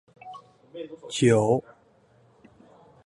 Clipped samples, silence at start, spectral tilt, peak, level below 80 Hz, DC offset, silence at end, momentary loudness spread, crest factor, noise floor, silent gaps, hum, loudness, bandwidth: under 0.1%; 0.25 s; -6 dB/octave; -8 dBFS; -64 dBFS; under 0.1%; 1.45 s; 25 LU; 20 dB; -60 dBFS; none; none; -23 LUFS; 11.5 kHz